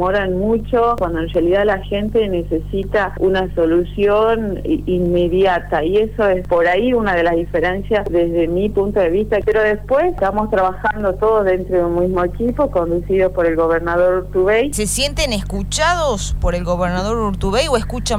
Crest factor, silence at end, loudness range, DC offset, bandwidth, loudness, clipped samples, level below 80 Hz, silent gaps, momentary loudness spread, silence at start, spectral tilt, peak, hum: 14 dB; 0 s; 1 LU; 2%; 19.5 kHz; -17 LUFS; under 0.1%; -28 dBFS; none; 4 LU; 0 s; -5 dB/octave; -2 dBFS; 50 Hz at -30 dBFS